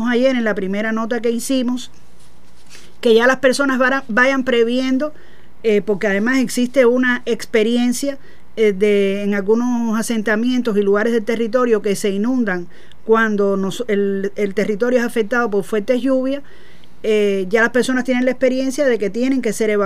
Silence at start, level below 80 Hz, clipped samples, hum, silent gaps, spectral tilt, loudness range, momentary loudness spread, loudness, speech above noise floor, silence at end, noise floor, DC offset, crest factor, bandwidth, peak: 0 s; -54 dBFS; under 0.1%; none; none; -5 dB/octave; 2 LU; 6 LU; -17 LUFS; 32 dB; 0 s; -49 dBFS; 4%; 16 dB; 15.5 kHz; -2 dBFS